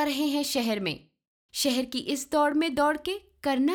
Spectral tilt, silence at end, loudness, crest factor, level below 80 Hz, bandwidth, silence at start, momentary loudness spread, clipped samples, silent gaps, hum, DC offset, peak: -3 dB/octave; 0 s; -27 LUFS; 14 dB; -62 dBFS; 20 kHz; 0 s; 8 LU; under 0.1%; 1.28-1.49 s; none; under 0.1%; -14 dBFS